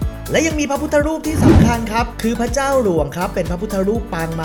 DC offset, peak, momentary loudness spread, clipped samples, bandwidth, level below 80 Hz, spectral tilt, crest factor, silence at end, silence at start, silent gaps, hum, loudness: under 0.1%; 0 dBFS; 9 LU; under 0.1%; 19 kHz; -28 dBFS; -6 dB/octave; 16 dB; 0 s; 0 s; none; none; -17 LUFS